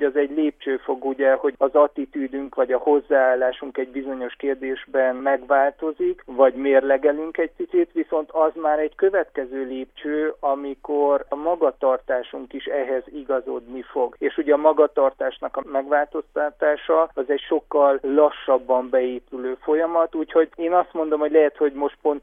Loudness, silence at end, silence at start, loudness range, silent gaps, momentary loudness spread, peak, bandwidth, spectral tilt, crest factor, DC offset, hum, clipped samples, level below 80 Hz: -22 LUFS; 0.05 s; 0 s; 3 LU; none; 10 LU; -4 dBFS; 3.7 kHz; -7 dB/octave; 18 dB; under 0.1%; none; under 0.1%; -58 dBFS